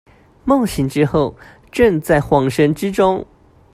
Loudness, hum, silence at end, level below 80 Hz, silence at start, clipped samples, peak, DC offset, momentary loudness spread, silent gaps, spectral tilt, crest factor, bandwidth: -16 LUFS; none; 0.5 s; -40 dBFS; 0.45 s; under 0.1%; 0 dBFS; under 0.1%; 9 LU; none; -6.5 dB/octave; 16 dB; 15.5 kHz